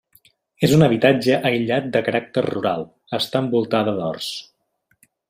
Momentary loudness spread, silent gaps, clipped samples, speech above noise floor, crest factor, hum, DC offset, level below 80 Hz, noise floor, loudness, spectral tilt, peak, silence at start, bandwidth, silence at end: 13 LU; none; under 0.1%; 48 dB; 18 dB; none; under 0.1%; -56 dBFS; -68 dBFS; -20 LUFS; -6 dB/octave; -2 dBFS; 0.6 s; 15.5 kHz; 0.9 s